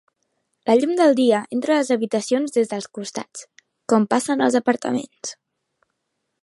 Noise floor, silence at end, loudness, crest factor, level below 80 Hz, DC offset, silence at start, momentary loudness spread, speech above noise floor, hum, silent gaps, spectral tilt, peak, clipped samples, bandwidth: -76 dBFS; 1.1 s; -20 LUFS; 18 dB; -74 dBFS; under 0.1%; 0.65 s; 16 LU; 57 dB; none; none; -4.5 dB/octave; -2 dBFS; under 0.1%; 11.5 kHz